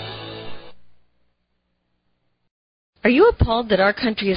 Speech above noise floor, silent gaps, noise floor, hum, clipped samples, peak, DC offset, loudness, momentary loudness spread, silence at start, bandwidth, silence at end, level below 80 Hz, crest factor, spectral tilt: 54 dB; 2.51-2.93 s; -71 dBFS; 60 Hz at -60 dBFS; under 0.1%; -4 dBFS; under 0.1%; -18 LUFS; 20 LU; 0 s; 5.4 kHz; 0 s; -36 dBFS; 18 dB; -11 dB/octave